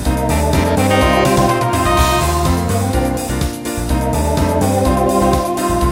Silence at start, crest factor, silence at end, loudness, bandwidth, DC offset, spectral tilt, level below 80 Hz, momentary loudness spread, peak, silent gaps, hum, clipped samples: 0 s; 14 dB; 0 s; -15 LUFS; 16.5 kHz; under 0.1%; -5.5 dB/octave; -22 dBFS; 6 LU; 0 dBFS; none; none; under 0.1%